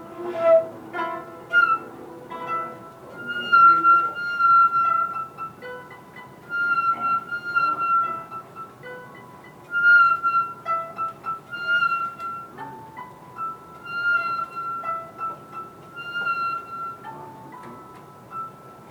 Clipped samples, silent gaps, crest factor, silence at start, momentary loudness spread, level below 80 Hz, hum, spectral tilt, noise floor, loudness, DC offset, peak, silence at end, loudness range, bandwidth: under 0.1%; none; 18 dB; 0 s; 24 LU; -68 dBFS; none; -4.5 dB/octave; -44 dBFS; -21 LUFS; under 0.1%; -6 dBFS; 0 s; 11 LU; 17 kHz